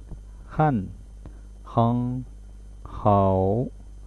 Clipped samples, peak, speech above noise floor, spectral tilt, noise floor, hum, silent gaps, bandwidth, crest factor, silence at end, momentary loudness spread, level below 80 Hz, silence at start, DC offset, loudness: under 0.1%; -6 dBFS; 20 dB; -10 dB/octave; -42 dBFS; 50 Hz at -40 dBFS; none; 9.8 kHz; 18 dB; 0 s; 24 LU; -42 dBFS; 0 s; under 0.1%; -24 LUFS